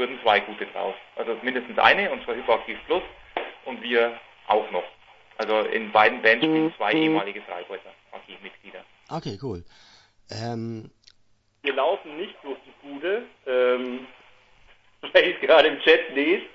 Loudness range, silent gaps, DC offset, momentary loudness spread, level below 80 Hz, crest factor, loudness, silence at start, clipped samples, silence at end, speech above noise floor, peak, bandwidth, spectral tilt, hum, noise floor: 14 LU; none; under 0.1%; 21 LU; -62 dBFS; 24 dB; -23 LUFS; 0 s; under 0.1%; 0.05 s; 38 dB; -2 dBFS; 7.8 kHz; -5.5 dB/octave; none; -62 dBFS